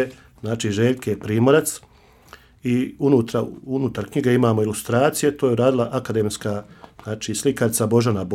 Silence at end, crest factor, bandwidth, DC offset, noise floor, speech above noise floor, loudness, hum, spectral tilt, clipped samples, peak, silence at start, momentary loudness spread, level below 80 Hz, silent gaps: 0 s; 18 dB; 16.5 kHz; under 0.1%; -48 dBFS; 28 dB; -21 LUFS; none; -5.5 dB/octave; under 0.1%; -4 dBFS; 0 s; 11 LU; -54 dBFS; none